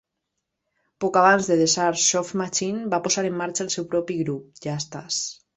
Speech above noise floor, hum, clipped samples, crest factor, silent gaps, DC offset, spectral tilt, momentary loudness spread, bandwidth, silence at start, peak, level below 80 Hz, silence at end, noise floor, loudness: 58 dB; none; under 0.1%; 20 dB; none; under 0.1%; -3 dB/octave; 12 LU; 8.4 kHz; 1 s; -4 dBFS; -66 dBFS; 0.25 s; -80 dBFS; -22 LUFS